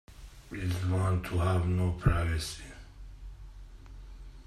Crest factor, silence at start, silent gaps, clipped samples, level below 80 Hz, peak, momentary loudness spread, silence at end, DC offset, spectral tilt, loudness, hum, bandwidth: 20 dB; 0.1 s; none; under 0.1%; -42 dBFS; -12 dBFS; 23 LU; 0.05 s; under 0.1%; -6.5 dB/octave; -31 LUFS; none; 13 kHz